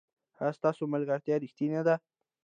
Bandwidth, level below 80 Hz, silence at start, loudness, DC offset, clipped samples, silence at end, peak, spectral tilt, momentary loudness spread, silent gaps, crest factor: 9.4 kHz; -84 dBFS; 0.4 s; -31 LUFS; under 0.1%; under 0.1%; 0.45 s; -14 dBFS; -8.5 dB/octave; 4 LU; none; 18 dB